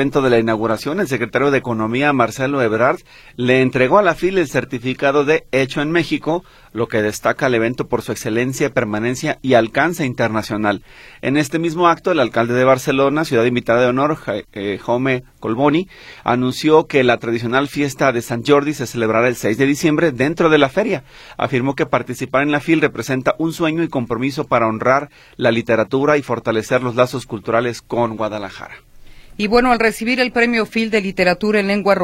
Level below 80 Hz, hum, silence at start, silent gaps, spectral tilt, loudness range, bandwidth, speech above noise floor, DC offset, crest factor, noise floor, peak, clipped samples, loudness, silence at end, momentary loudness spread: -46 dBFS; none; 0 s; none; -5.5 dB/octave; 3 LU; 16.5 kHz; 22 dB; under 0.1%; 16 dB; -39 dBFS; 0 dBFS; under 0.1%; -17 LUFS; 0 s; 8 LU